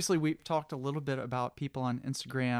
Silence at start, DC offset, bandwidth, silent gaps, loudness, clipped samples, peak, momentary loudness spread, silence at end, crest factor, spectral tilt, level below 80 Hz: 0 s; under 0.1%; 16 kHz; none; -34 LUFS; under 0.1%; -18 dBFS; 6 LU; 0 s; 16 dB; -5 dB/octave; -68 dBFS